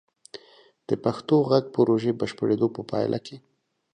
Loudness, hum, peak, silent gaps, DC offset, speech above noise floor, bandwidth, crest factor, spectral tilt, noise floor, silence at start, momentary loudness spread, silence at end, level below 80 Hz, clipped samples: -24 LUFS; none; -6 dBFS; none; under 0.1%; 32 dB; 10 kHz; 20 dB; -7.5 dB/octave; -56 dBFS; 0.35 s; 23 LU; 0.55 s; -66 dBFS; under 0.1%